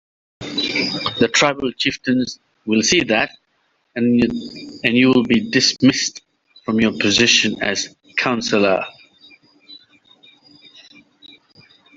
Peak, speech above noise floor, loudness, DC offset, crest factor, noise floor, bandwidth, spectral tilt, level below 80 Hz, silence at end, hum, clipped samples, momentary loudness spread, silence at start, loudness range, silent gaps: 0 dBFS; 48 dB; -17 LUFS; under 0.1%; 20 dB; -65 dBFS; 7.8 kHz; -3 dB/octave; -54 dBFS; 2.2 s; none; under 0.1%; 12 LU; 0.4 s; 7 LU; none